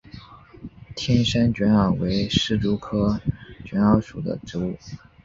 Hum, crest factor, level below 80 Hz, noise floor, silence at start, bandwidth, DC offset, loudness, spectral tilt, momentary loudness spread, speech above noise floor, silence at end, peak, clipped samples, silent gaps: none; 20 dB; -42 dBFS; -44 dBFS; 0.15 s; 7.6 kHz; under 0.1%; -22 LUFS; -6.5 dB/octave; 19 LU; 22 dB; 0.25 s; -4 dBFS; under 0.1%; none